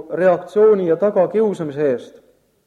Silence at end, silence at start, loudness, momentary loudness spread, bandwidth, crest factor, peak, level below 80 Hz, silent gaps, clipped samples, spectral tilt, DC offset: 0.55 s; 0 s; -17 LUFS; 7 LU; 9 kHz; 14 dB; -4 dBFS; -64 dBFS; none; under 0.1%; -8 dB/octave; under 0.1%